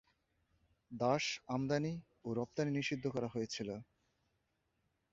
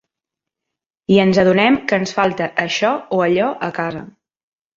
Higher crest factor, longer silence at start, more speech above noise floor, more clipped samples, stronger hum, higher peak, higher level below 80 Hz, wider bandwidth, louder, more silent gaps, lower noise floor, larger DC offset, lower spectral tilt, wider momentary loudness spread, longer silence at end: about the same, 20 dB vs 16 dB; second, 0.9 s vs 1.1 s; second, 44 dB vs 68 dB; neither; neither; second, -20 dBFS vs -2 dBFS; second, -72 dBFS vs -54 dBFS; about the same, 7.6 kHz vs 7.6 kHz; second, -39 LUFS vs -16 LUFS; neither; about the same, -82 dBFS vs -84 dBFS; neither; about the same, -5 dB/octave vs -5.5 dB/octave; about the same, 10 LU vs 11 LU; first, 1.3 s vs 0.7 s